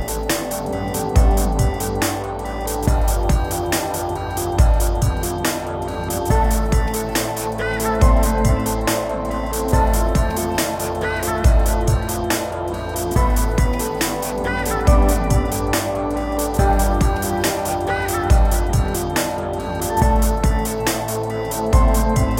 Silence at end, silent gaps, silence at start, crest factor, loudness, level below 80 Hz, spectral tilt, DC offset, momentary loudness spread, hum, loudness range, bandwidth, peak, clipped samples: 0 s; none; 0 s; 16 dB; -20 LUFS; -20 dBFS; -5 dB/octave; under 0.1%; 7 LU; none; 2 LU; 17 kHz; -2 dBFS; under 0.1%